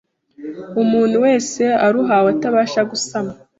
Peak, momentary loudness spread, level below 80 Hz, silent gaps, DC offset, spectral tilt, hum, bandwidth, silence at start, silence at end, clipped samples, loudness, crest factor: -2 dBFS; 11 LU; -60 dBFS; none; under 0.1%; -4.5 dB/octave; none; 8 kHz; 0.4 s; 0.25 s; under 0.1%; -16 LUFS; 14 dB